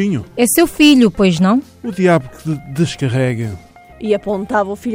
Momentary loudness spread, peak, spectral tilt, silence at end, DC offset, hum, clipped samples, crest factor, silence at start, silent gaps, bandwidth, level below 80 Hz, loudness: 14 LU; -2 dBFS; -5.5 dB/octave; 0 s; under 0.1%; none; under 0.1%; 14 dB; 0 s; none; 17 kHz; -44 dBFS; -14 LUFS